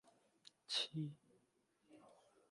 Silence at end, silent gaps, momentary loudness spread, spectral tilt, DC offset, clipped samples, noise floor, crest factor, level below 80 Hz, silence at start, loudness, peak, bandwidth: 0.4 s; none; 25 LU; -3.5 dB/octave; under 0.1%; under 0.1%; -80 dBFS; 22 dB; under -90 dBFS; 0.45 s; -44 LUFS; -28 dBFS; 11.5 kHz